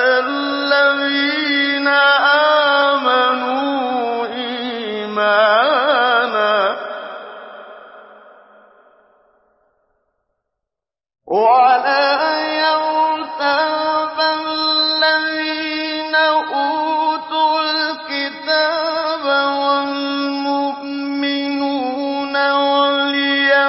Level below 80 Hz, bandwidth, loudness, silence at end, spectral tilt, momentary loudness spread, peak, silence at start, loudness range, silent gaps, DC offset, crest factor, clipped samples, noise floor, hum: -70 dBFS; 5.8 kHz; -16 LUFS; 0 s; -6 dB/octave; 9 LU; -2 dBFS; 0 s; 5 LU; none; under 0.1%; 14 dB; under 0.1%; -87 dBFS; none